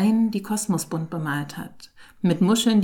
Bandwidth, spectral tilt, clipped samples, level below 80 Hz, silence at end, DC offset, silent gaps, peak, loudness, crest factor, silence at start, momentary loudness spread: 18 kHz; -5 dB/octave; under 0.1%; -62 dBFS; 0 s; under 0.1%; none; -8 dBFS; -23 LUFS; 14 dB; 0 s; 14 LU